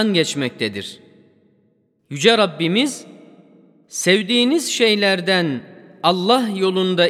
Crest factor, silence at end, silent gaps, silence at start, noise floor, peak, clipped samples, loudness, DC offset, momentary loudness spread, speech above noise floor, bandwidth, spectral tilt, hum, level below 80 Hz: 20 dB; 0 s; none; 0 s; -62 dBFS; 0 dBFS; under 0.1%; -17 LUFS; under 0.1%; 15 LU; 44 dB; 15.5 kHz; -4 dB/octave; none; -72 dBFS